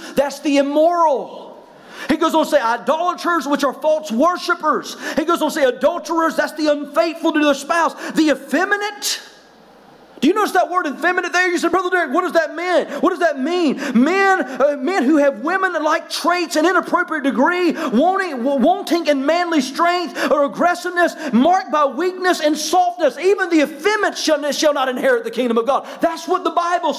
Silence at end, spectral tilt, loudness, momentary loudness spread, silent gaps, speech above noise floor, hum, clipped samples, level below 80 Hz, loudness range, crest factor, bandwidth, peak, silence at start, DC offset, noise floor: 0 s; -3.5 dB/octave; -17 LUFS; 4 LU; none; 29 dB; none; under 0.1%; -62 dBFS; 2 LU; 12 dB; 16 kHz; -6 dBFS; 0 s; under 0.1%; -46 dBFS